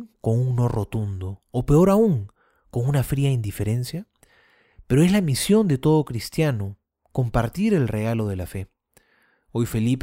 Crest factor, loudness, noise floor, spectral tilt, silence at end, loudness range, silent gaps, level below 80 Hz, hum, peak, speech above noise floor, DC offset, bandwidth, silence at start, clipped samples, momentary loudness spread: 16 dB; -22 LUFS; -63 dBFS; -7 dB/octave; 0 s; 4 LU; none; -42 dBFS; none; -6 dBFS; 42 dB; under 0.1%; 16 kHz; 0 s; under 0.1%; 14 LU